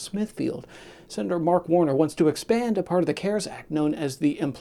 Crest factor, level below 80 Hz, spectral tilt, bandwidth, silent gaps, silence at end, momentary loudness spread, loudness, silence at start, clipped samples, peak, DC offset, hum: 18 dB; -60 dBFS; -6 dB/octave; 13.5 kHz; none; 0 s; 9 LU; -25 LUFS; 0 s; under 0.1%; -6 dBFS; under 0.1%; none